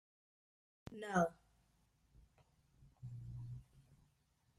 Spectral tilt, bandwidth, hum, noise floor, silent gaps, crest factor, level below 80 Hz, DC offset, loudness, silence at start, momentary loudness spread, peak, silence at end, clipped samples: -6.5 dB/octave; 13.5 kHz; none; -78 dBFS; none; 24 dB; -70 dBFS; under 0.1%; -42 LUFS; 0.85 s; 19 LU; -22 dBFS; 0.65 s; under 0.1%